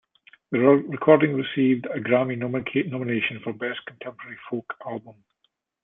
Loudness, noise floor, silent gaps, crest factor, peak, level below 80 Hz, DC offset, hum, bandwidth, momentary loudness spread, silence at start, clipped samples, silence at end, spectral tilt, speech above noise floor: -23 LUFS; -73 dBFS; none; 22 dB; -2 dBFS; -66 dBFS; under 0.1%; none; 3.9 kHz; 17 LU; 0.5 s; under 0.1%; 0.7 s; -10.5 dB/octave; 49 dB